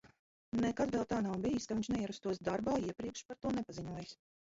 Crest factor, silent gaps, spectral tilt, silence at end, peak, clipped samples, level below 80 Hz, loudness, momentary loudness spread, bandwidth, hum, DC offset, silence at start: 16 dB; 0.19-0.52 s, 3.25-3.29 s; -6 dB/octave; 0.25 s; -22 dBFS; under 0.1%; -62 dBFS; -38 LUFS; 9 LU; 7.6 kHz; none; under 0.1%; 0.05 s